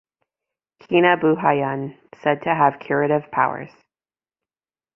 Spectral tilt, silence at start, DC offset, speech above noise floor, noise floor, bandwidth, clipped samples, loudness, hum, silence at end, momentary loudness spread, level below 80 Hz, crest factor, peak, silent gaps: -8.5 dB/octave; 0.9 s; under 0.1%; over 71 dB; under -90 dBFS; 5.8 kHz; under 0.1%; -20 LUFS; none; 1.3 s; 13 LU; -64 dBFS; 20 dB; -2 dBFS; none